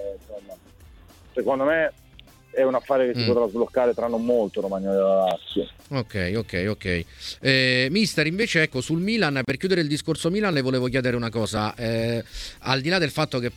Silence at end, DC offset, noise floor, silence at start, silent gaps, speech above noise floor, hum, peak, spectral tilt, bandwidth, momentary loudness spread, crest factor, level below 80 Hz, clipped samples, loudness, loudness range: 0.05 s; under 0.1%; -50 dBFS; 0 s; none; 27 dB; none; -4 dBFS; -5.5 dB/octave; 16.5 kHz; 9 LU; 20 dB; -50 dBFS; under 0.1%; -23 LUFS; 3 LU